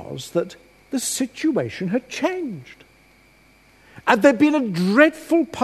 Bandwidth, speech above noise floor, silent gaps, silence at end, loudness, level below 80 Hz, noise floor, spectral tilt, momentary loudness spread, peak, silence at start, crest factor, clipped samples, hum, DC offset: 13.5 kHz; 34 dB; none; 0 s; -20 LUFS; -60 dBFS; -54 dBFS; -4.5 dB/octave; 14 LU; 0 dBFS; 0 s; 20 dB; under 0.1%; none; under 0.1%